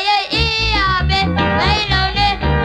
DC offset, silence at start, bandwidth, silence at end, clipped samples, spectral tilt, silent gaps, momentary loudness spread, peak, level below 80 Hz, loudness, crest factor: under 0.1%; 0 s; 9.8 kHz; 0 s; under 0.1%; -5 dB/octave; none; 1 LU; -2 dBFS; -24 dBFS; -15 LUFS; 12 dB